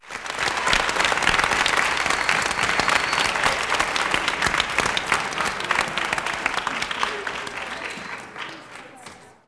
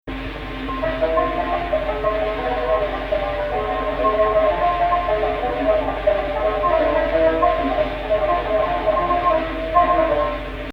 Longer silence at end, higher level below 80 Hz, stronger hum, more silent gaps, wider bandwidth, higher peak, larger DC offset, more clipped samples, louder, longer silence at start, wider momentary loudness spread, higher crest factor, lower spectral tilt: first, 0.15 s vs 0 s; second, -46 dBFS vs -32 dBFS; neither; neither; first, 11 kHz vs 6 kHz; about the same, -4 dBFS vs -4 dBFS; neither; neither; about the same, -21 LUFS vs -20 LUFS; about the same, 0 s vs 0.05 s; first, 14 LU vs 6 LU; about the same, 20 dB vs 16 dB; second, -1.5 dB/octave vs -7 dB/octave